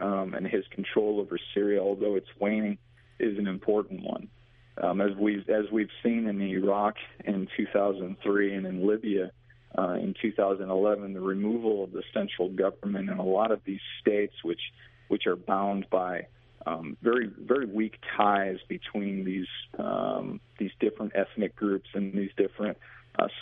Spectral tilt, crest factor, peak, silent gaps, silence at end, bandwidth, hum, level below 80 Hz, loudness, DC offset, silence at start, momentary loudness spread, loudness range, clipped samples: -10 dB/octave; 22 dB; -8 dBFS; none; 0 s; 3.9 kHz; none; -64 dBFS; -30 LUFS; under 0.1%; 0 s; 8 LU; 2 LU; under 0.1%